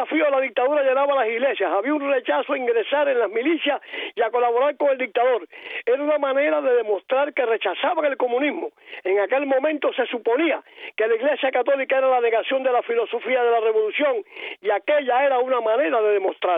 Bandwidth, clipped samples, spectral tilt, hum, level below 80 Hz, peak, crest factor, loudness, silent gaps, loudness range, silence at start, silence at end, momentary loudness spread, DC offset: 3.9 kHz; under 0.1%; -6 dB/octave; none; -86 dBFS; -10 dBFS; 12 dB; -21 LUFS; none; 2 LU; 0 s; 0 s; 5 LU; under 0.1%